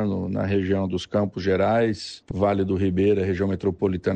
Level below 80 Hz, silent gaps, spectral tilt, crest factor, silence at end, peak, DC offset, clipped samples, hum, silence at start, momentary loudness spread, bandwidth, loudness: -50 dBFS; none; -7.5 dB/octave; 14 dB; 0 s; -8 dBFS; under 0.1%; under 0.1%; none; 0 s; 5 LU; 9 kHz; -23 LUFS